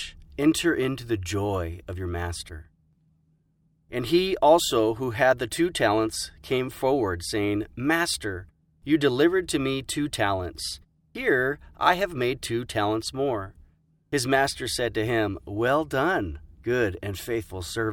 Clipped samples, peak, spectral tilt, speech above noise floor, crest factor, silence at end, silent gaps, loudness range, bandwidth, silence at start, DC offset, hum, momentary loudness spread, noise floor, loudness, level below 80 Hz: under 0.1%; -4 dBFS; -4.5 dB/octave; 42 dB; 22 dB; 0 s; none; 5 LU; 18 kHz; 0 s; under 0.1%; none; 11 LU; -67 dBFS; -25 LUFS; -48 dBFS